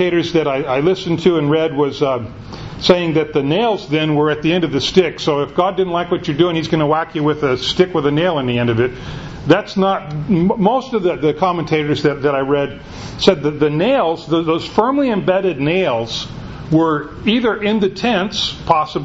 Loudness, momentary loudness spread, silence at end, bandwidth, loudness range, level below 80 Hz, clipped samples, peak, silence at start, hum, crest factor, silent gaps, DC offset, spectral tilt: -16 LUFS; 5 LU; 0 s; 8 kHz; 1 LU; -42 dBFS; under 0.1%; 0 dBFS; 0 s; none; 16 dB; none; under 0.1%; -6 dB/octave